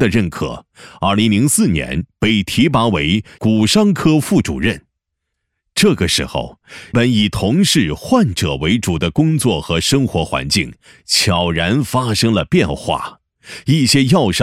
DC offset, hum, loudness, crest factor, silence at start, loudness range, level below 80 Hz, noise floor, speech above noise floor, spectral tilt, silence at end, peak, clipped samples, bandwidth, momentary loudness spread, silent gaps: under 0.1%; none; -15 LUFS; 12 dB; 0 s; 2 LU; -38 dBFS; -76 dBFS; 61 dB; -4.5 dB/octave; 0 s; -2 dBFS; under 0.1%; 16 kHz; 10 LU; none